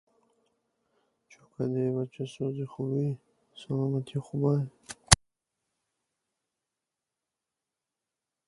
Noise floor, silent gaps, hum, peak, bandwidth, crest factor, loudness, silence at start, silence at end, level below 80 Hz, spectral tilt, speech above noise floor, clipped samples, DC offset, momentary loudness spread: -88 dBFS; none; none; 0 dBFS; 12 kHz; 34 dB; -29 LUFS; 1.6 s; 3.35 s; -50 dBFS; -4 dB/octave; 58 dB; under 0.1%; under 0.1%; 14 LU